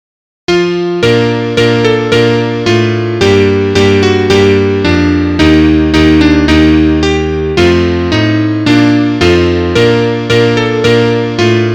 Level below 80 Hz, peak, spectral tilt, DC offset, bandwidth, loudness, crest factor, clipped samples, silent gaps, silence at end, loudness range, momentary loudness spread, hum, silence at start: -24 dBFS; 0 dBFS; -6 dB/octave; under 0.1%; 10.5 kHz; -9 LUFS; 8 dB; 0.3%; none; 0 s; 2 LU; 4 LU; none; 0.5 s